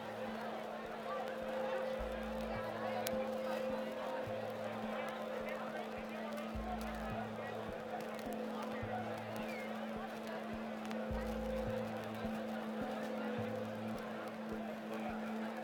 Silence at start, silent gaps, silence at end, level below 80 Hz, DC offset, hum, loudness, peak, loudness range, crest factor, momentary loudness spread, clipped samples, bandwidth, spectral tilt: 0 s; none; 0 s; -58 dBFS; under 0.1%; none; -42 LUFS; -16 dBFS; 3 LU; 26 dB; 4 LU; under 0.1%; 17 kHz; -5.5 dB/octave